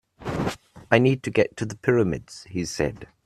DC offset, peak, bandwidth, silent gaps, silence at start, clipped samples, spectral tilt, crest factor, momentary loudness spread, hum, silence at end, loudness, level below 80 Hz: under 0.1%; 0 dBFS; 13.5 kHz; none; 0.2 s; under 0.1%; -6 dB/octave; 24 dB; 13 LU; none; 0.2 s; -24 LUFS; -50 dBFS